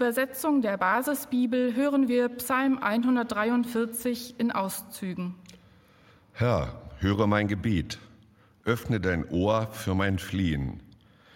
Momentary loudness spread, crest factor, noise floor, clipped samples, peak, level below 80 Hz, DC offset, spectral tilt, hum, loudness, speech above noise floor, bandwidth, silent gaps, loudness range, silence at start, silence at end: 11 LU; 18 dB; -58 dBFS; under 0.1%; -8 dBFS; -52 dBFS; under 0.1%; -6 dB/octave; none; -27 LUFS; 32 dB; 17 kHz; none; 5 LU; 0 s; 0.55 s